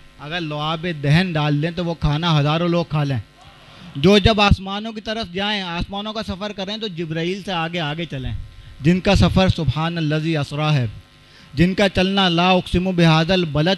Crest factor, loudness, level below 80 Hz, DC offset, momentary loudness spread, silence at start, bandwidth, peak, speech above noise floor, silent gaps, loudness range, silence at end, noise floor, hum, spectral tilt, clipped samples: 20 dB; -19 LUFS; -34 dBFS; under 0.1%; 12 LU; 0.2 s; 12 kHz; 0 dBFS; 28 dB; none; 6 LU; 0 s; -47 dBFS; none; -6.5 dB/octave; under 0.1%